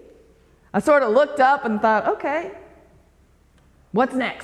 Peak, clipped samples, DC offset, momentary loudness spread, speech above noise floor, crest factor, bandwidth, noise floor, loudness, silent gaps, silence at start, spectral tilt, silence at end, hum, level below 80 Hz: -4 dBFS; under 0.1%; under 0.1%; 11 LU; 37 dB; 18 dB; 12.5 kHz; -56 dBFS; -20 LUFS; none; 0.75 s; -5.5 dB/octave; 0 s; none; -58 dBFS